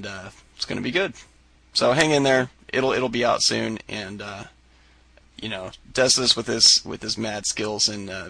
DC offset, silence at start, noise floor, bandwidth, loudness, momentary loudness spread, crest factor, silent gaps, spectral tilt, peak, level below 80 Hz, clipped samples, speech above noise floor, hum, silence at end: under 0.1%; 0 s; -55 dBFS; 10.5 kHz; -21 LUFS; 18 LU; 20 dB; none; -2.5 dB/octave; -4 dBFS; -54 dBFS; under 0.1%; 32 dB; none; 0 s